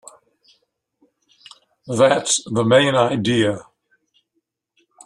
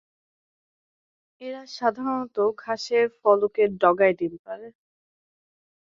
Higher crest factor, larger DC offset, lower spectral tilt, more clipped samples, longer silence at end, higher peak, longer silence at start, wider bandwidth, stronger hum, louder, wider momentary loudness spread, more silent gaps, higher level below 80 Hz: about the same, 20 dB vs 22 dB; neither; second, -4 dB/octave vs -5.5 dB/octave; neither; first, 1.45 s vs 1.15 s; about the same, -2 dBFS vs -4 dBFS; first, 1.85 s vs 1.4 s; first, 12 kHz vs 7.6 kHz; neither; first, -17 LUFS vs -23 LUFS; second, 8 LU vs 18 LU; second, none vs 4.39-4.45 s; first, -60 dBFS vs -70 dBFS